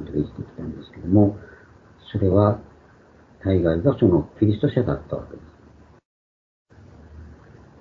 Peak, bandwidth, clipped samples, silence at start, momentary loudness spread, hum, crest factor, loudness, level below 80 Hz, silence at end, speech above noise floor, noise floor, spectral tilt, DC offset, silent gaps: -4 dBFS; 4.5 kHz; under 0.1%; 0 s; 16 LU; none; 20 dB; -21 LUFS; -46 dBFS; 0.45 s; 31 dB; -52 dBFS; -11 dB/octave; under 0.1%; 6.05-6.65 s